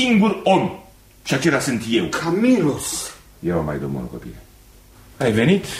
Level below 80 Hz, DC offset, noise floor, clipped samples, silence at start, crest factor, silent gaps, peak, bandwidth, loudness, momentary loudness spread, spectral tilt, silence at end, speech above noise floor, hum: -46 dBFS; under 0.1%; -47 dBFS; under 0.1%; 0 s; 16 dB; none; -4 dBFS; 16 kHz; -20 LUFS; 16 LU; -5 dB/octave; 0 s; 28 dB; none